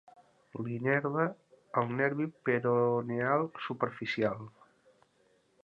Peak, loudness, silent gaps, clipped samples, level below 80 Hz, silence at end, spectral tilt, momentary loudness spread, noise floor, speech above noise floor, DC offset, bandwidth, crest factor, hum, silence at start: -14 dBFS; -32 LUFS; none; under 0.1%; -74 dBFS; 1.15 s; -8.5 dB/octave; 10 LU; -70 dBFS; 38 dB; under 0.1%; 7 kHz; 20 dB; none; 0.55 s